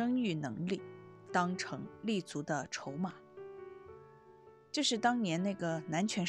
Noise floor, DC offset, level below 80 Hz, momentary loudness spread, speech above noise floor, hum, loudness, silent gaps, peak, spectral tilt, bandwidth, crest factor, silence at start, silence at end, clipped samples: -59 dBFS; under 0.1%; -78 dBFS; 20 LU; 24 dB; none; -36 LUFS; none; -18 dBFS; -4.5 dB/octave; 11.5 kHz; 20 dB; 0 s; 0 s; under 0.1%